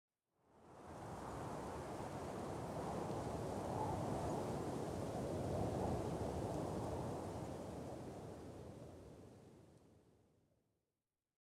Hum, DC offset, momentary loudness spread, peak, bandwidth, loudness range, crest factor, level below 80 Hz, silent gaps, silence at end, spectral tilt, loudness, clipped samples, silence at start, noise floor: none; under 0.1%; 15 LU; -30 dBFS; 16.5 kHz; 11 LU; 16 dB; -62 dBFS; none; 1.4 s; -6.5 dB/octave; -45 LUFS; under 0.1%; 0.55 s; under -90 dBFS